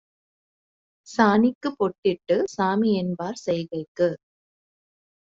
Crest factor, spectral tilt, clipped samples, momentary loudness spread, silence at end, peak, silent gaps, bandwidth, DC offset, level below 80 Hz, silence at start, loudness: 22 dB; -6.5 dB/octave; under 0.1%; 10 LU; 1.2 s; -4 dBFS; 1.55-1.61 s, 1.98-2.02 s, 3.88-3.95 s; 7.8 kHz; under 0.1%; -66 dBFS; 1.1 s; -24 LUFS